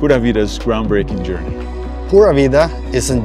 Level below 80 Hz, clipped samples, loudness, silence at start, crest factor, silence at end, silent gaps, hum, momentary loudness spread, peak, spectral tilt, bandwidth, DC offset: -24 dBFS; under 0.1%; -14 LUFS; 0 s; 14 dB; 0 s; none; none; 14 LU; 0 dBFS; -6 dB/octave; 14 kHz; under 0.1%